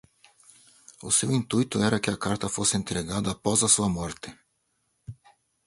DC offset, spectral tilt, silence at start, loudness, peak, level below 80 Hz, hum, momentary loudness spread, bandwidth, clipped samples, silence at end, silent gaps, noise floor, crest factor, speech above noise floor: under 0.1%; -3.5 dB/octave; 1 s; -25 LUFS; -8 dBFS; -52 dBFS; none; 22 LU; 11.5 kHz; under 0.1%; 0.55 s; none; -74 dBFS; 20 dB; 48 dB